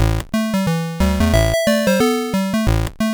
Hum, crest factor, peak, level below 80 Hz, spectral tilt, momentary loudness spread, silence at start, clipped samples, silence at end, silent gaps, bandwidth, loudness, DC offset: none; 12 dB; -6 dBFS; -24 dBFS; -5.5 dB/octave; 4 LU; 0 s; under 0.1%; 0 s; none; over 20 kHz; -17 LUFS; under 0.1%